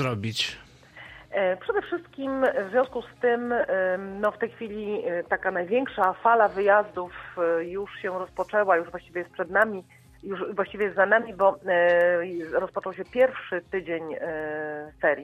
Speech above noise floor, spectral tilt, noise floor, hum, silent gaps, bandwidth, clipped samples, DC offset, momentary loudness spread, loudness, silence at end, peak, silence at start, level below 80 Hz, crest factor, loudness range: 22 dB; -5.5 dB/octave; -48 dBFS; none; none; 13.5 kHz; under 0.1%; under 0.1%; 13 LU; -26 LUFS; 0 s; -6 dBFS; 0 s; -60 dBFS; 20 dB; 4 LU